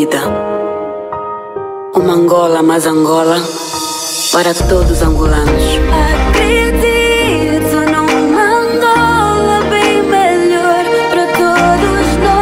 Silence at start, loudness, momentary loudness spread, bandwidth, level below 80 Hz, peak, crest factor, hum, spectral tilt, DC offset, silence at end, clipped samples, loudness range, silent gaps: 0 s; -11 LUFS; 8 LU; 16.5 kHz; -20 dBFS; 0 dBFS; 10 dB; none; -4.5 dB/octave; under 0.1%; 0 s; under 0.1%; 2 LU; none